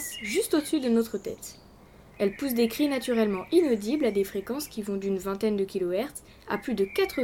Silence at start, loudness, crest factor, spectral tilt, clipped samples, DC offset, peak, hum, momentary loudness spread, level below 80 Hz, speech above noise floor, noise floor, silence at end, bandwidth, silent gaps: 0 s; -28 LUFS; 16 dB; -4.5 dB/octave; under 0.1%; under 0.1%; -10 dBFS; none; 9 LU; -58 dBFS; 25 dB; -52 dBFS; 0 s; 18 kHz; none